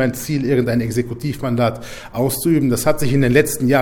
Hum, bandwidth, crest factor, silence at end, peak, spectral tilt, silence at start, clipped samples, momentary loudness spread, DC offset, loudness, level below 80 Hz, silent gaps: none; 19 kHz; 16 dB; 0 s; 0 dBFS; -6 dB/octave; 0 s; under 0.1%; 8 LU; under 0.1%; -18 LUFS; -42 dBFS; none